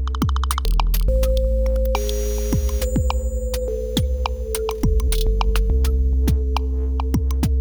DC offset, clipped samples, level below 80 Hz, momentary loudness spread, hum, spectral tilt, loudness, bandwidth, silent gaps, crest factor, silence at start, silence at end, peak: under 0.1%; under 0.1%; -20 dBFS; 4 LU; none; -6 dB/octave; -22 LUFS; over 20 kHz; none; 16 dB; 0 s; 0 s; -2 dBFS